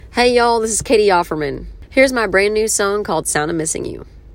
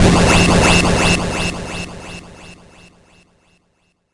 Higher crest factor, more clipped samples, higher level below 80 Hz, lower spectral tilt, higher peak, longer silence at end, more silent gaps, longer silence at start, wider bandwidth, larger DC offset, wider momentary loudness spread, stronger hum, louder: about the same, 16 dB vs 16 dB; neither; second, -38 dBFS vs -28 dBFS; second, -3 dB/octave vs -4.5 dB/octave; about the same, 0 dBFS vs 0 dBFS; second, 0 s vs 1.6 s; neither; about the same, 0.05 s vs 0 s; first, 16.5 kHz vs 11.5 kHz; neither; second, 11 LU vs 21 LU; neither; second, -16 LUFS vs -13 LUFS